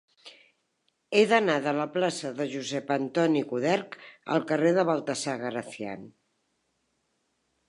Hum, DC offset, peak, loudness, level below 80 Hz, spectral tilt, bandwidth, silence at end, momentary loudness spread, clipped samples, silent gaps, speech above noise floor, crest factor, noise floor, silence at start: none; under 0.1%; -6 dBFS; -27 LUFS; -80 dBFS; -5 dB/octave; 11.5 kHz; 1.6 s; 14 LU; under 0.1%; none; 48 dB; 22 dB; -75 dBFS; 0.25 s